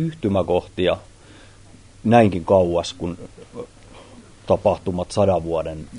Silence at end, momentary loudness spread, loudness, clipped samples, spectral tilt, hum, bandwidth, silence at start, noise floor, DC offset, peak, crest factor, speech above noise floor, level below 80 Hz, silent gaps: 0 s; 22 LU; -20 LUFS; under 0.1%; -7 dB/octave; none; 10.5 kHz; 0 s; -46 dBFS; under 0.1%; 0 dBFS; 20 dB; 26 dB; -46 dBFS; none